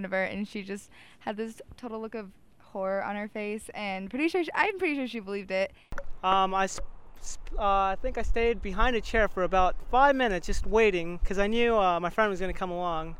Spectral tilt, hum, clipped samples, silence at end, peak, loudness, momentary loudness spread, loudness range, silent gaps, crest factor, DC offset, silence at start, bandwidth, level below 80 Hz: -5 dB/octave; none; under 0.1%; 0 s; -8 dBFS; -28 LUFS; 16 LU; 9 LU; none; 20 dB; under 0.1%; 0 s; 12 kHz; -38 dBFS